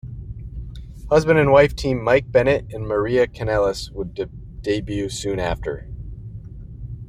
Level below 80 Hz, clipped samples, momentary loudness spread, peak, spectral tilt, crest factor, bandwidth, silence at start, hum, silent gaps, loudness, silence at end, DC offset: -36 dBFS; under 0.1%; 21 LU; -2 dBFS; -6 dB/octave; 20 dB; 15 kHz; 0.05 s; none; none; -20 LUFS; 0 s; under 0.1%